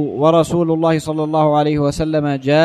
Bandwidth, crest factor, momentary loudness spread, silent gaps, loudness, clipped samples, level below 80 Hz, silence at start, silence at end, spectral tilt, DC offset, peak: 13 kHz; 14 dB; 4 LU; none; -16 LUFS; under 0.1%; -42 dBFS; 0 s; 0 s; -7 dB/octave; under 0.1%; -2 dBFS